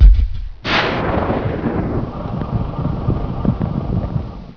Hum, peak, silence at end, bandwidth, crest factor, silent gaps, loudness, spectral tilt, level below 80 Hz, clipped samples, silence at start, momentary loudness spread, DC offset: none; 0 dBFS; 0 s; 5.4 kHz; 16 dB; none; -20 LUFS; -8 dB/octave; -18 dBFS; 0.2%; 0 s; 8 LU; under 0.1%